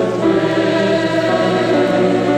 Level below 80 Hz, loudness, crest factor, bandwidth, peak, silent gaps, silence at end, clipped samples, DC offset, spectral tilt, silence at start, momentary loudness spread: -52 dBFS; -15 LUFS; 10 dB; 10.5 kHz; -4 dBFS; none; 0 s; under 0.1%; under 0.1%; -6 dB/octave; 0 s; 1 LU